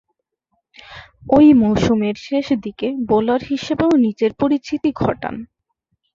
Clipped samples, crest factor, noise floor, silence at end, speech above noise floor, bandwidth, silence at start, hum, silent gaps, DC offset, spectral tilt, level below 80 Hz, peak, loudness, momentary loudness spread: under 0.1%; 16 dB; -72 dBFS; 0.7 s; 56 dB; 7.4 kHz; 0.9 s; none; none; under 0.1%; -7 dB/octave; -46 dBFS; -2 dBFS; -17 LUFS; 14 LU